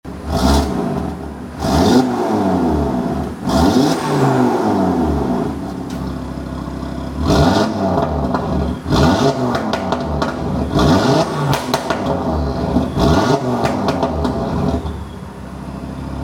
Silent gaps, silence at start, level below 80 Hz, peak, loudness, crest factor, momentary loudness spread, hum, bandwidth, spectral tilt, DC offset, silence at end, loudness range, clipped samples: none; 0.05 s; -28 dBFS; 0 dBFS; -17 LUFS; 16 dB; 12 LU; none; 17.5 kHz; -6.5 dB/octave; under 0.1%; 0 s; 3 LU; under 0.1%